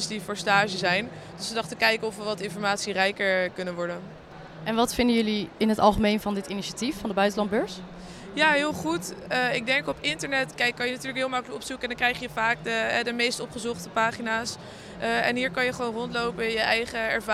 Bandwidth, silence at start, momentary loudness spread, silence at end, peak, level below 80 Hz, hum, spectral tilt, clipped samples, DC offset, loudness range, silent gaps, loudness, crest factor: 15.5 kHz; 0 s; 10 LU; 0 s; -6 dBFS; -52 dBFS; none; -3.5 dB/octave; under 0.1%; under 0.1%; 2 LU; none; -26 LUFS; 20 dB